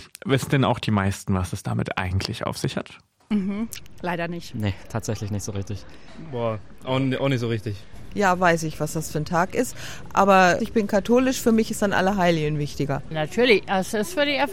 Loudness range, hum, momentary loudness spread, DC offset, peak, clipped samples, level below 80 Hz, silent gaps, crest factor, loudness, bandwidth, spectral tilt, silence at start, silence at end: 9 LU; none; 12 LU; 1%; -4 dBFS; under 0.1%; -48 dBFS; none; 20 dB; -23 LUFS; 16.5 kHz; -5.5 dB/octave; 0 s; 0 s